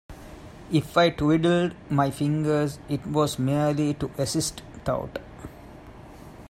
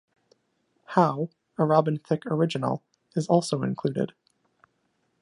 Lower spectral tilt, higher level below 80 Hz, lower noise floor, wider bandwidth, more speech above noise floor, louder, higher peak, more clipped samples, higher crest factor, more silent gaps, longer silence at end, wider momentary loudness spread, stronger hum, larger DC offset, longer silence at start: about the same, -6 dB/octave vs -7 dB/octave; first, -50 dBFS vs -74 dBFS; second, -45 dBFS vs -73 dBFS; first, 16 kHz vs 11 kHz; second, 21 dB vs 48 dB; about the same, -25 LUFS vs -26 LUFS; about the same, -8 dBFS vs -6 dBFS; neither; about the same, 18 dB vs 22 dB; neither; second, 0 s vs 1.15 s; first, 23 LU vs 11 LU; neither; neither; second, 0.1 s vs 0.9 s